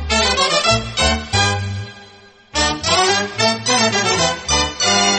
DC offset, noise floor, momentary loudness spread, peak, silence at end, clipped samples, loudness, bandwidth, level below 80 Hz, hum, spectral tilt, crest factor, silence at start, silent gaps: under 0.1%; -44 dBFS; 7 LU; -2 dBFS; 0 s; under 0.1%; -16 LUFS; 8.8 kHz; -32 dBFS; none; -2.5 dB/octave; 14 dB; 0 s; none